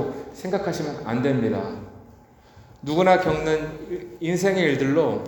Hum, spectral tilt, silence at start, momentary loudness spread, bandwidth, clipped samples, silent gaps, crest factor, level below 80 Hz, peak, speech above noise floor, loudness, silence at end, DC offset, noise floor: none; -6 dB/octave; 0 s; 15 LU; over 20 kHz; under 0.1%; none; 20 dB; -52 dBFS; -4 dBFS; 28 dB; -23 LUFS; 0 s; under 0.1%; -50 dBFS